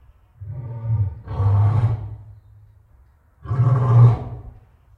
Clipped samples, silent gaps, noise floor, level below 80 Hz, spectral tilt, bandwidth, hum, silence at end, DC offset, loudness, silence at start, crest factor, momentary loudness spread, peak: under 0.1%; none; -53 dBFS; -42 dBFS; -10.5 dB/octave; 3.3 kHz; none; 0.5 s; under 0.1%; -19 LUFS; 0.4 s; 18 dB; 22 LU; -2 dBFS